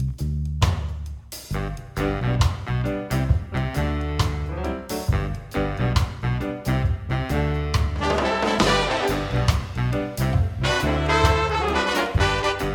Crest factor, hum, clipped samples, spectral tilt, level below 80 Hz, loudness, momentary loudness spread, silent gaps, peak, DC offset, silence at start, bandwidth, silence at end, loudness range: 20 dB; none; under 0.1%; -5.5 dB/octave; -30 dBFS; -23 LUFS; 9 LU; none; -4 dBFS; under 0.1%; 0 s; 19 kHz; 0 s; 4 LU